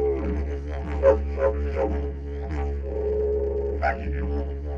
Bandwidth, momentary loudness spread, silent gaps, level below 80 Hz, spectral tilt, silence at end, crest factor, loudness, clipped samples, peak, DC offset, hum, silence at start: 5.6 kHz; 10 LU; none; -30 dBFS; -9 dB/octave; 0 s; 18 dB; -26 LUFS; under 0.1%; -6 dBFS; under 0.1%; none; 0 s